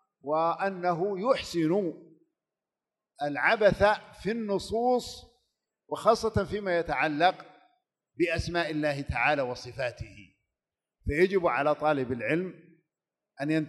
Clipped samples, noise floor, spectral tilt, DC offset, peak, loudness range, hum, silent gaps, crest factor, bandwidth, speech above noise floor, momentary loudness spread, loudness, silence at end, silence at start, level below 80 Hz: under 0.1%; under -90 dBFS; -5.5 dB/octave; under 0.1%; -8 dBFS; 3 LU; none; none; 20 dB; 12 kHz; over 62 dB; 11 LU; -28 LUFS; 0 s; 0.25 s; -50 dBFS